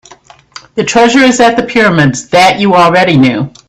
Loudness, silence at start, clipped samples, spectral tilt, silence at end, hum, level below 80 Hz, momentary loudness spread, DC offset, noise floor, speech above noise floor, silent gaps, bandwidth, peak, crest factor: -7 LUFS; 0.75 s; 0.3%; -5 dB/octave; 0.2 s; none; -44 dBFS; 5 LU; under 0.1%; -39 dBFS; 31 dB; none; 13.5 kHz; 0 dBFS; 8 dB